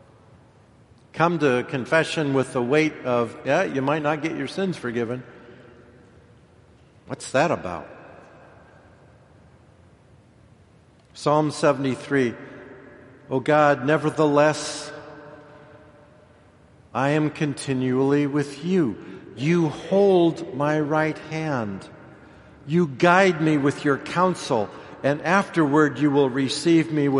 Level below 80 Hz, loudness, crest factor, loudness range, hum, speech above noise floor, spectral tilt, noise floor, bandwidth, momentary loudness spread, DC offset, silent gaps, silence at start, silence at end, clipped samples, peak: -62 dBFS; -22 LUFS; 22 dB; 9 LU; none; 33 dB; -6 dB/octave; -54 dBFS; 11.5 kHz; 15 LU; under 0.1%; none; 1.15 s; 0 s; under 0.1%; -2 dBFS